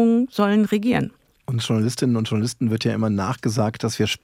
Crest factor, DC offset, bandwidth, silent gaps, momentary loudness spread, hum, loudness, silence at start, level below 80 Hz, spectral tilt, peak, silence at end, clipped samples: 16 dB; under 0.1%; 15.5 kHz; none; 6 LU; none; -22 LUFS; 0 s; -58 dBFS; -6 dB/octave; -4 dBFS; 0.05 s; under 0.1%